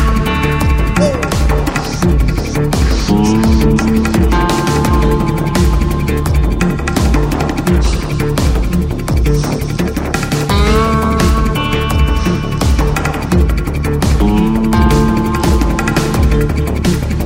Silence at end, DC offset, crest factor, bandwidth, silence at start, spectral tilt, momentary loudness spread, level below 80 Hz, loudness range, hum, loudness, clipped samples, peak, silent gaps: 0 s; under 0.1%; 12 dB; 16.5 kHz; 0 s; -6 dB/octave; 5 LU; -16 dBFS; 2 LU; none; -13 LUFS; under 0.1%; 0 dBFS; none